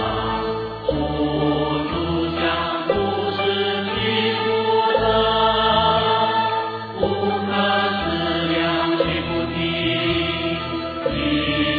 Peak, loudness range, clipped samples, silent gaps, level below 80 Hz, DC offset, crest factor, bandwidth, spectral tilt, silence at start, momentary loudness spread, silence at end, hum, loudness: -4 dBFS; 3 LU; under 0.1%; none; -40 dBFS; under 0.1%; 16 dB; 5.2 kHz; -8 dB/octave; 0 s; 7 LU; 0 s; none; -20 LUFS